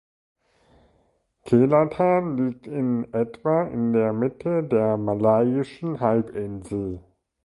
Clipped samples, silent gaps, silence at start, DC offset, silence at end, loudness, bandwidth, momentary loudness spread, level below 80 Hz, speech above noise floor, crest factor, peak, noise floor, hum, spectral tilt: under 0.1%; none; 1.45 s; under 0.1%; 0.45 s; -23 LUFS; 11.5 kHz; 11 LU; -56 dBFS; 44 dB; 18 dB; -6 dBFS; -66 dBFS; none; -9.5 dB/octave